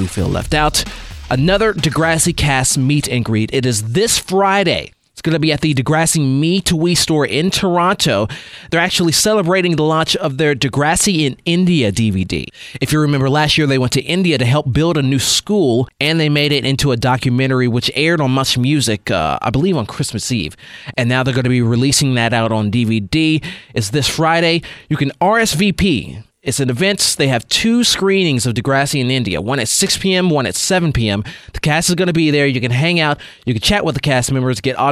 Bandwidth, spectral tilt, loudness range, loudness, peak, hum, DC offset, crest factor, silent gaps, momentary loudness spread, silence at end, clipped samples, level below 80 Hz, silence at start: 16 kHz; -4.5 dB/octave; 2 LU; -15 LUFS; 0 dBFS; none; under 0.1%; 14 dB; none; 7 LU; 0 s; under 0.1%; -36 dBFS; 0 s